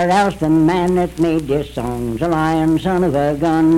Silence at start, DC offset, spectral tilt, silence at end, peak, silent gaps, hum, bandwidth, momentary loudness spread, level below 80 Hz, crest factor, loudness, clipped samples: 0 s; under 0.1%; -7 dB/octave; 0 s; -4 dBFS; none; none; 13.5 kHz; 6 LU; -36 dBFS; 12 dB; -17 LUFS; under 0.1%